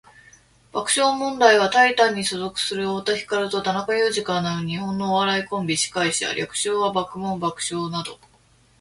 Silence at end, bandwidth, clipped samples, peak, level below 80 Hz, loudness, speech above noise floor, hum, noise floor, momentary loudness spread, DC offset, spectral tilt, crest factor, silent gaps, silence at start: 0.65 s; 11.5 kHz; under 0.1%; -2 dBFS; -60 dBFS; -21 LUFS; 35 dB; none; -57 dBFS; 10 LU; under 0.1%; -3 dB/octave; 22 dB; none; 0.75 s